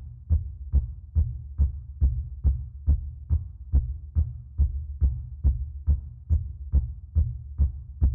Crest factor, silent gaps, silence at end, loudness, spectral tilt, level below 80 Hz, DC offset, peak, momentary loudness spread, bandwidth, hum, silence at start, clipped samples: 14 dB; none; 0 s; -29 LUFS; -13.5 dB/octave; -28 dBFS; under 0.1%; -12 dBFS; 2 LU; 1.1 kHz; none; 0 s; under 0.1%